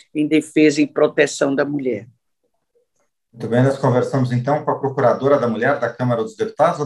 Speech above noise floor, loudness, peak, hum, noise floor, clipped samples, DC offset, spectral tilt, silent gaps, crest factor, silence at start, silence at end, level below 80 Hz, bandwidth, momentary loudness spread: 55 dB; -18 LUFS; -2 dBFS; none; -72 dBFS; under 0.1%; under 0.1%; -6.5 dB/octave; none; 16 dB; 0.15 s; 0 s; -66 dBFS; 11.5 kHz; 6 LU